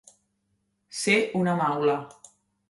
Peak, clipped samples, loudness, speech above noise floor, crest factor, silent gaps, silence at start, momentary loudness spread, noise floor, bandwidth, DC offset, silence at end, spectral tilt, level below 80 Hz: -8 dBFS; under 0.1%; -25 LUFS; 50 dB; 20 dB; none; 0.9 s; 13 LU; -74 dBFS; 11.5 kHz; under 0.1%; 0.6 s; -4.5 dB/octave; -72 dBFS